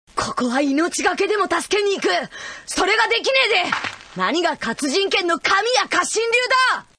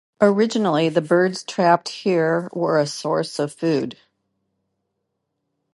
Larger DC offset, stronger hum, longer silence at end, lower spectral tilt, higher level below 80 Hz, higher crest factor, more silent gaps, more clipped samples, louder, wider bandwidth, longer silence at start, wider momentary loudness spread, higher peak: neither; neither; second, 0.15 s vs 1.85 s; second, -2 dB/octave vs -5.5 dB/octave; first, -54 dBFS vs -72 dBFS; about the same, 16 dB vs 20 dB; neither; neither; about the same, -19 LUFS vs -20 LUFS; about the same, 11 kHz vs 11.5 kHz; about the same, 0.15 s vs 0.2 s; about the same, 8 LU vs 6 LU; about the same, -4 dBFS vs -2 dBFS